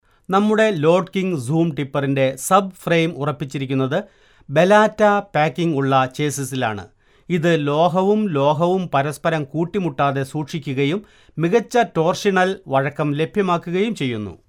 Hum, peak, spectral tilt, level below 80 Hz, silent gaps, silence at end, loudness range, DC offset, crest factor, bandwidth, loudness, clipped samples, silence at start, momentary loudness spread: none; -2 dBFS; -6 dB/octave; -56 dBFS; none; 0.1 s; 2 LU; under 0.1%; 18 dB; 16 kHz; -19 LUFS; under 0.1%; 0.3 s; 8 LU